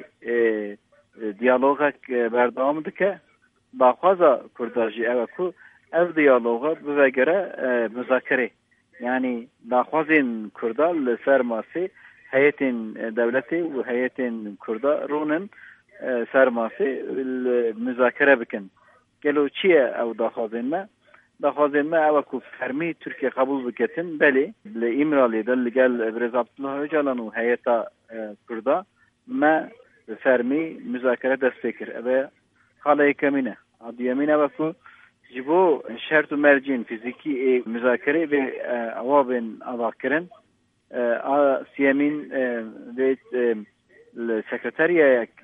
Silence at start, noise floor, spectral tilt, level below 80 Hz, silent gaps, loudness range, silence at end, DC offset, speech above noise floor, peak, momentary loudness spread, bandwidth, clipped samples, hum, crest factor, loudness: 0 s; -66 dBFS; -8 dB/octave; -78 dBFS; none; 3 LU; 0.15 s; under 0.1%; 43 dB; -4 dBFS; 12 LU; 3.8 kHz; under 0.1%; none; 20 dB; -23 LUFS